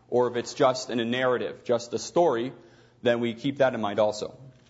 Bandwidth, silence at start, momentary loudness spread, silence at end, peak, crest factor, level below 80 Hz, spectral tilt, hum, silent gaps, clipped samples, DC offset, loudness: 8 kHz; 0.1 s; 6 LU; 0.2 s; -8 dBFS; 18 dB; -68 dBFS; -5 dB/octave; none; none; under 0.1%; under 0.1%; -26 LUFS